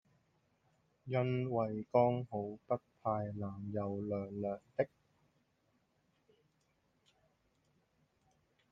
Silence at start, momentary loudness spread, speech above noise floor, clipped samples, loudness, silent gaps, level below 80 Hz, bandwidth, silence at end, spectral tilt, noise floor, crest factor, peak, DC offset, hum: 1.05 s; 10 LU; 41 dB; under 0.1%; -38 LUFS; none; -76 dBFS; 5.8 kHz; 3.85 s; -10 dB/octave; -78 dBFS; 24 dB; -16 dBFS; under 0.1%; none